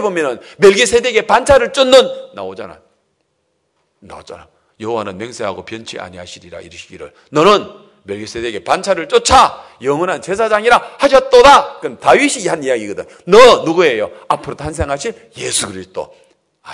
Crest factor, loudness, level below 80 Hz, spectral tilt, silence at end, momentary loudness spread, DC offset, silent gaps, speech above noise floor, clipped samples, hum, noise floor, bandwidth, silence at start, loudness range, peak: 14 dB; -12 LUFS; -42 dBFS; -3 dB/octave; 0 s; 22 LU; under 0.1%; none; 53 dB; 1%; none; -66 dBFS; 12 kHz; 0 s; 16 LU; 0 dBFS